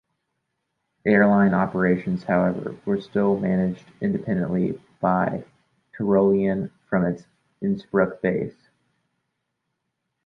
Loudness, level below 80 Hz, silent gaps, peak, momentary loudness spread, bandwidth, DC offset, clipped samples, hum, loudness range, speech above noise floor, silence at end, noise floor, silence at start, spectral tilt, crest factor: -23 LUFS; -56 dBFS; none; -4 dBFS; 10 LU; 5.2 kHz; under 0.1%; under 0.1%; none; 5 LU; 57 dB; 1.75 s; -79 dBFS; 1.05 s; -10 dB/octave; 18 dB